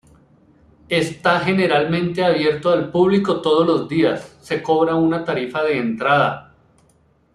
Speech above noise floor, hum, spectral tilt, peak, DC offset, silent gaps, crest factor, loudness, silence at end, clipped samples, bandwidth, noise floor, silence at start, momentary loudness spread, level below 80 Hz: 40 dB; none; -6.5 dB/octave; -2 dBFS; under 0.1%; none; 16 dB; -18 LUFS; 0.95 s; under 0.1%; 12 kHz; -57 dBFS; 0.9 s; 6 LU; -56 dBFS